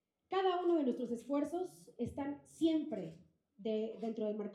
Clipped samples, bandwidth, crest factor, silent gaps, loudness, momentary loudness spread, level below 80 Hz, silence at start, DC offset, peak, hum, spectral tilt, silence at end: under 0.1%; 12.5 kHz; 16 dB; none; -38 LUFS; 11 LU; -74 dBFS; 0.3 s; under 0.1%; -22 dBFS; none; -6.5 dB/octave; 0 s